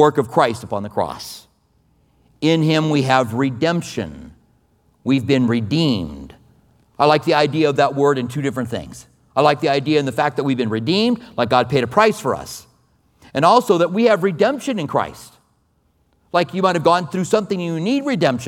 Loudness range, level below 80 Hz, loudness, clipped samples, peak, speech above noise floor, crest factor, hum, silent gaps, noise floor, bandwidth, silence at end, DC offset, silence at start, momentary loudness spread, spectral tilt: 3 LU; -52 dBFS; -18 LUFS; under 0.1%; 0 dBFS; 44 dB; 18 dB; none; none; -62 dBFS; 17 kHz; 0 s; under 0.1%; 0 s; 12 LU; -6 dB/octave